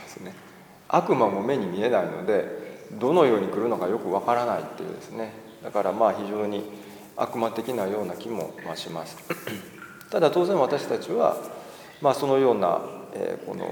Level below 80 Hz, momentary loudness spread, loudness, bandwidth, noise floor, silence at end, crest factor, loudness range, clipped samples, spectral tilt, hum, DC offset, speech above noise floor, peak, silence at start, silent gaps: -72 dBFS; 18 LU; -26 LUFS; over 20 kHz; -49 dBFS; 0 s; 20 dB; 6 LU; under 0.1%; -6 dB/octave; none; under 0.1%; 24 dB; -6 dBFS; 0 s; none